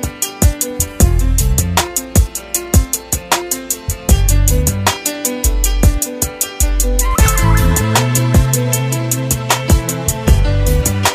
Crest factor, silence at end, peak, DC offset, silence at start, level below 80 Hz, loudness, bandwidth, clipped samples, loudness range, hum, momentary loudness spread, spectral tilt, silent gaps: 14 dB; 0 s; 0 dBFS; under 0.1%; 0 s; -16 dBFS; -15 LUFS; 16 kHz; under 0.1%; 2 LU; none; 5 LU; -4 dB/octave; none